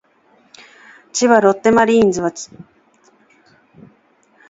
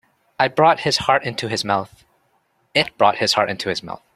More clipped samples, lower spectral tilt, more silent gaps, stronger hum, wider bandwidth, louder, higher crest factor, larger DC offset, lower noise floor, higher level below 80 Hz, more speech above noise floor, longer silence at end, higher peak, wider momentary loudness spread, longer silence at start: neither; about the same, -4.5 dB/octave vs -3.5 dB/octave; neither; neither; second, 8 kHz vs 14.5 kHz; first, -14 LUFS vs -19 LUFS; about the same, 18 dB vs 20 dB; neither; second, -55 dBFS vs -64 dBFS; about the same, -54 dBFS vs -56 dBFS; about the same, 42 dB vs 45 dB; first, 1.9 s vs 0.2 s; about the same, 0 dBFS vs 0 dBFS; first, 16 LU vs 9 LU; first, 1.15 s vs 0.4 s